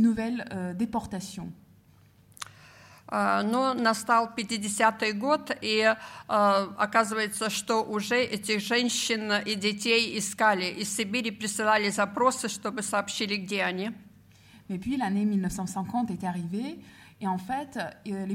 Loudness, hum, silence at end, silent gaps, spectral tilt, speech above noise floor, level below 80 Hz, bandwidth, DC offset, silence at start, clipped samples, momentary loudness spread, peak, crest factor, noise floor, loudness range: -27 LUFS; none; 0 s; none; -3.5 dB/octave; 31 dB; -62 dBFS; 16.5 kHz; under 0.1%; 0 s; under 0.1%; 12 LU; -8 dBFS; 20 dB; -58 dBFS; 6 LU